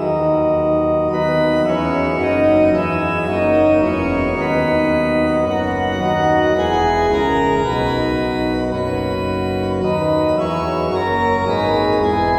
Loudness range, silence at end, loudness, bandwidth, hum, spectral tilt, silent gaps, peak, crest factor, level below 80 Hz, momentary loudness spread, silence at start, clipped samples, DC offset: 3 LU; 0 s; -17 LUFS; 12.5 kHz; none; -7 dB/octave; none; -4 dBFS; 14 dB; -36 dBFS; 5 LU; 0 s; under 0.1%; under 0.1%